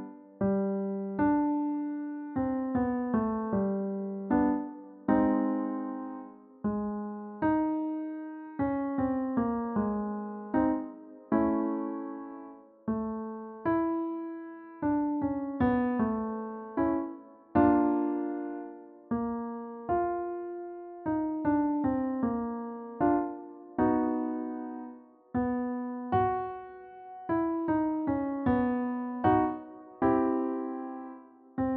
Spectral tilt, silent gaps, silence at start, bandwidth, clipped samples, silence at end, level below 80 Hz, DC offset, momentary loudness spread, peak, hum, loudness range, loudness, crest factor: -8.5 dB/octave; none; 0 s; 3.8 kHz; under 0.1%; 0 s; -58 dBFS; under 0.1%; 14 LU; -12 dBFS; none; 4 LU; -31 LUFS; 18 dB